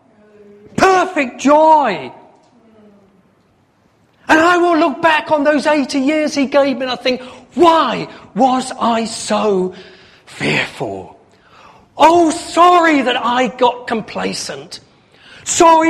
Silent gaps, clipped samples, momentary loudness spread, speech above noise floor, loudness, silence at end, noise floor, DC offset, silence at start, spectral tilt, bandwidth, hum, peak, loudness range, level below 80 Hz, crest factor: none; under 0.1%; 15 LU; 41 dB; -14 LUFS; 0 s; -55 dBFS; under 0.1%; 0.75 s; -3.5 dB/octave; 14.5 kHz; none; 0 dBFS; 4 LU; -54 dBFS; 14 dB